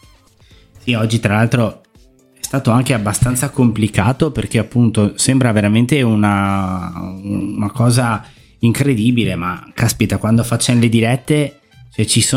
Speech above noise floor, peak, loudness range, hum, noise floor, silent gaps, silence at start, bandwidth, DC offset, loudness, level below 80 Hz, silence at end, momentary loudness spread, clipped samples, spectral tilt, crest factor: 34 dB; 0 dBFS; 3 LU; none; -49 dBFS; none; 0.85 s; 16 kHz; under 0.1%; -15 LUFS; -40 dBFS; 0 s; 9 LU; under 0.1%; -5.5 dB/octave; 14 dB